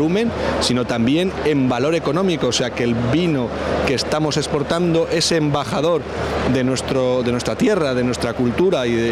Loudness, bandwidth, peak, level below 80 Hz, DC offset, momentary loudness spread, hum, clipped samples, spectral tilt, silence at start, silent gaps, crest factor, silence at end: -19 LUFS; 14 kHz; -6 dBFS; -40 dBFS; under 0.1%; 3 LU; none; under 0.1%; -5 dB/octave; 0 s; none; 12 dB; 0 s